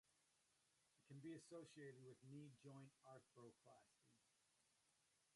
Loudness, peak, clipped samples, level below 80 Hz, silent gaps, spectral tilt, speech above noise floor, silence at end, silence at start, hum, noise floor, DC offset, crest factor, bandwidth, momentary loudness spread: -63 LUFS; -48 dBFS; under 0.1%; under -90 dBFS; none; -6 dB/octave; 21 dB; 0 s; 0.05 s; none; -85 dBFS; under 0.1%; 18 dB; 11.5 kHz; 9 LU